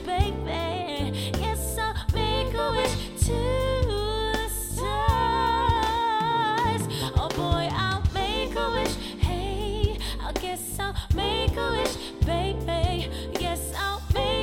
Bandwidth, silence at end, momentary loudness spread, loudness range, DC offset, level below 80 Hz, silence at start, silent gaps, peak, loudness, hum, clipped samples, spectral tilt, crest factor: 17 kHz; 0 s; 6 LU; 3 LU; under 0.1%; -32 dBFS; 0 s; none; -8 dBFS; -27 LUFS; none; under 0.1%; -4.5 dB/octave; 18 dB